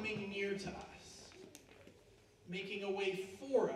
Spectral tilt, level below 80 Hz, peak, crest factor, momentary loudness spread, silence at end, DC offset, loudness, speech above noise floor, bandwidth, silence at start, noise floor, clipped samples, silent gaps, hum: -5 dB/octave; -70 dBFS; -22 dBFS; 20 dB; 22 LU; 0 s; under 0.1%; -41 LUFS; 26 dB; 14 kHz; 0 s; -65 dBFS; under 0.1%; none; none